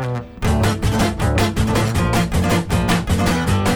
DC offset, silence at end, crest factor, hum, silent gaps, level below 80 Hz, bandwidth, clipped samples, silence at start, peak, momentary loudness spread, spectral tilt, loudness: under 0.1%; 0 s; 16 dB; none; none; -26 dBFS; over 20 kHz; under 0.1%; 0 s; -2 dBFS; 1 LU; -5.5 dB/octave; -18 LUFS